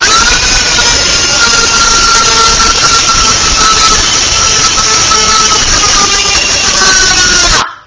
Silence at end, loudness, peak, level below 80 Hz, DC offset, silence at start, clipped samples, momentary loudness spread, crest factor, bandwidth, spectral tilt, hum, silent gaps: 0.1 s; -4 LUFS; 0 dBFS; -22 dBFS; under 0.1%; 0 s; 3%; 2 LU; 6 dB; 8 kHz; 0 dB/octave; none; none